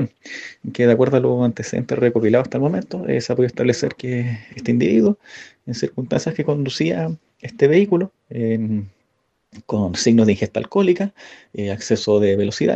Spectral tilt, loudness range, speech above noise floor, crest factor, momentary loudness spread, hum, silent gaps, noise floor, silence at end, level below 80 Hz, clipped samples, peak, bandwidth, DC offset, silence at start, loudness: -6.5 dB/octave; 2 LU; 50 dB; 18 dB; 13 LU; none; none; -68 dBFS; 0 s; -56 dBFS; under 0.1%; -2 dBFS; 8.4 kHz; under 0.1%; 0 s; -19 LUFS